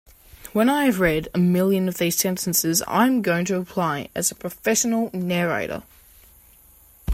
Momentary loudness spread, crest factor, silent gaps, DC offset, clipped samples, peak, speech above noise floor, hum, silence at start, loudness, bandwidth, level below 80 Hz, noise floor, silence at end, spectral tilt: 7 LU; 18 dB; none; under 0.1%; under 0.1%; -4 dBFS; 30 dB; none; 0.45 s; -21 LUFS; 16.5 kHz; -44 dBFS; -52 dBFS; 0 s; -4.5 dB/octave